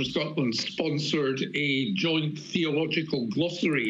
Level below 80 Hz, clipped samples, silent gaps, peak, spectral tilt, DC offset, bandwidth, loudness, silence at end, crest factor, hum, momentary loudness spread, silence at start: -66 dBFS; under 0.1%; none; -14 dBFS; -5 dB/octave; under 0.1%; 10 kHz; -27 LUFS; 0 s; 12 dB; none; 3 LU; 0 s